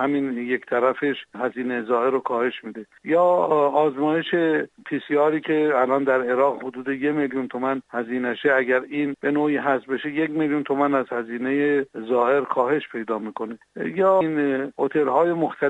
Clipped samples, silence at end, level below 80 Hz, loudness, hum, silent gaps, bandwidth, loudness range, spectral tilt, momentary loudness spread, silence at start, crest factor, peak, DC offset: under 0.1%; 0 s; -70 dBFS; -22 LUFS; none; none; 8 kHz; 2 LU; -7.5 dB/octave; 9 LU; 0 s; 16 dB; -6 dBFS; under 0.1%